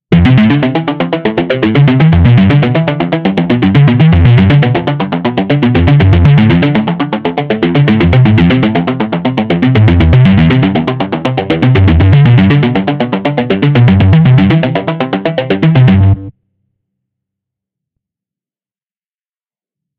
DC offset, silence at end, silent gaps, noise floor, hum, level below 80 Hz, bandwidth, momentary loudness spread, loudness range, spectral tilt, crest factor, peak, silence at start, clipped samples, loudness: under 0.1%; 3.7 s; none; under -90 dBFS; none; -26 dBFS; 5 kHz; 8 LU; 4 LU; -9.5 dB/octave; 8 dB; 0 dBFS; 0.1 s; 0.1%; -9 LUFS